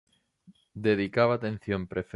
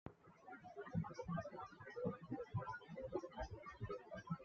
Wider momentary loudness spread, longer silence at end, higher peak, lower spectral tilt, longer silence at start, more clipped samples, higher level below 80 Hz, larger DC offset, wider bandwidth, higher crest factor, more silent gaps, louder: about the same, 8 LU vs 10 LU; about the same, 0.1 s vs 0 s; first, -10 dBFS vs -30 dBFS; about the same, -8 dB/octave vs -7 dB/octave; first, 0.75 s vs 0.05 s; neither; first, -56 dBFS vs -66 dBFS; neither; first, 10.5 kHz vs 7 kHz; about the same, 18 dB vs 20 dB; neither; first, -28 LUFS vs -49 LUFS